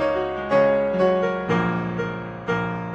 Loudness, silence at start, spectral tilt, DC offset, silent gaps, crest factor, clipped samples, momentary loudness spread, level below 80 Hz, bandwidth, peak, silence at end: -22 LUFS; 0 s; -7.5 dB/octave; under 0.1%; none; 14 dB; under 0.1%; 8 LU; -48 dBFS; 7.4 kHz; -8 dBFS; 0 s